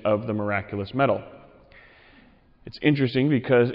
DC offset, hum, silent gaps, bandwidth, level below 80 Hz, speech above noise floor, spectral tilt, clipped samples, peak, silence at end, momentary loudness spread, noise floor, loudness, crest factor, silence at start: under 0.1%; none; none; 5.6 kHz; -58 dBFS; 32 dB; -10 dB/octave; under 0.1%; -6 dBFS; 0 s; 10 LU; -55 dBFS; -24 LUFS; 18 dB; 0.05 s